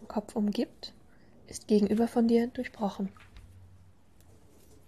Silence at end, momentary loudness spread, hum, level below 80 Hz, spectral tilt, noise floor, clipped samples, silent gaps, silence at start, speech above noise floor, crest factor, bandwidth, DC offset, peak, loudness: 1.5 s; 19 LU; none; -62 dBFS; -6.5 dB/octave; -60 dBFS; under 0.1%; none; 0 s; 31 dB; 18 dB; 13.5 kHz; 0.1%; -14 dBFS; -30 LUFS